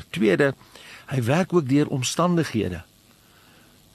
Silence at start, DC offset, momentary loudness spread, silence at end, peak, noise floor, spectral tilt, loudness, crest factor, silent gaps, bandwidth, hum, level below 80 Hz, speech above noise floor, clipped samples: 0 s; under 0.1%; 18 LU; 1.1 s; -6 dBFS; -55 dBFS; -5.5 dB/octave; -23 LUFS; 18 dB; none; 13 kHz; none; -56 dBFS; 33 dB; under 0.1%